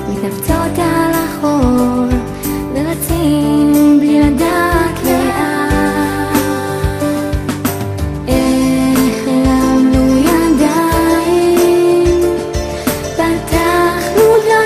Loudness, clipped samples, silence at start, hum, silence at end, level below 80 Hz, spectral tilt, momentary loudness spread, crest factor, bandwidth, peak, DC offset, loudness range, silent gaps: -13 LUFS; under 0.1%; 0 s; none; 0 s; -26 dBFS; -5.5 dB/octave; 8 LU; 12 dB; 15.5 kHz; 0 dBFS; under 0.1%; 4 LU; none